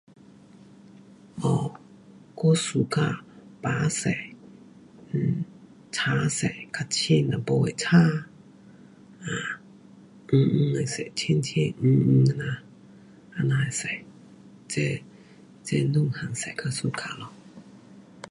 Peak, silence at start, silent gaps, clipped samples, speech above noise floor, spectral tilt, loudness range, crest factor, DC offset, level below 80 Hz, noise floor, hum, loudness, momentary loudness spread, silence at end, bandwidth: -6 dBFS; 1.35 s; none; under 0.1%; 27 dB; -5.5 dB/octave; 5 LU; 20 dB; under 0.1%; -60 dBFS; -51 dBFS; none; -26 LUFS; 16 LU; 0.3 s; 11.5 kHz